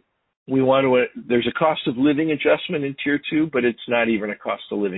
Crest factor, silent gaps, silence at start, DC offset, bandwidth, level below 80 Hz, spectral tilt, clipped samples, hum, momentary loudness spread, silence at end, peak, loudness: 18 dB; none; 0.5 s; under 0.1%; 4.1 kHz; -58 dBFS; -11 dB/octave; under 0.1%; none; 7 LU; 0 s; -4 dBFS; -21 LUFS